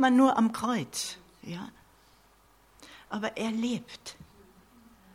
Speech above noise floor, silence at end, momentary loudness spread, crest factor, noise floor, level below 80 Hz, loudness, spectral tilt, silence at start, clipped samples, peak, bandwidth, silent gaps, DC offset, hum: 34 dB; 0.9 s; 23 LU; 20 dB; -62 dBFS; -66 dBFS; -29 LUFS; -4.5 dB/octave; 0 s; under 0.1%; -10 dBFS; 16 kHz; none; under 0.1%; none